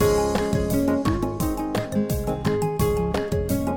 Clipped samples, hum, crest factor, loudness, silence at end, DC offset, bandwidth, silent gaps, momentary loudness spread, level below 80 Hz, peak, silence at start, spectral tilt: under 0.1%; none; 14 dB; -24 LUFS; 0 s; under 0.1%; 17.5 kHz; none; 4 LU; -34 dBFS; -8 dBFS; 0 s; -6.5 dB/octave